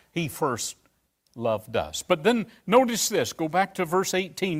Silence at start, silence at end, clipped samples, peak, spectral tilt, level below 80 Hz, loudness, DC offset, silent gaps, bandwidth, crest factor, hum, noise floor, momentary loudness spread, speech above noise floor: 0.15 s; 0 s; under 0.1%; -6 dBFS; -4 dB/octave; -60 dBFS; -25 LUFS; under 0.1%; none; 16 kHz; 20 dB; none; -68 dBFS; 9 LU; 43 dB